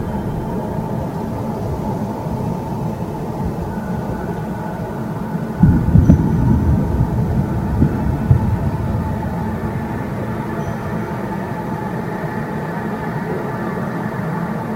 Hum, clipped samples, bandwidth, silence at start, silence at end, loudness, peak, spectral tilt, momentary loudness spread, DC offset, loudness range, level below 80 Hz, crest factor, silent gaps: none; under 0.1%; 16 kHz; 0 s; 0 s; -20 LUFS; 0 dBFS; -9 dB/octave; 9 LU; under 0.1%; 7 LU; -28 dBFS; 18 dB; none